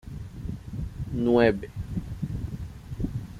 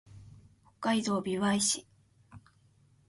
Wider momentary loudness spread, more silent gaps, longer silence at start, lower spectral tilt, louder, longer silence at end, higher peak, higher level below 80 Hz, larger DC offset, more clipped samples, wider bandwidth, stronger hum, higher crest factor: first, 17 LU vs 7 LU; neither; about the same, 0.05 s vs 0.1 s; first, -8 dB/octave vs -3.5 dB/octave; about the same, -29 LUFS vs -30 LUFS; second, 0 s vs 0.7 s; first, -6 dBFS vs -16 dBFS; first, -40 dBFS vs -66 dBFS; neither; neither; first, 14.5 kHz vs 11.5 kHz; neither; about the same, 22 dB vs 18 dB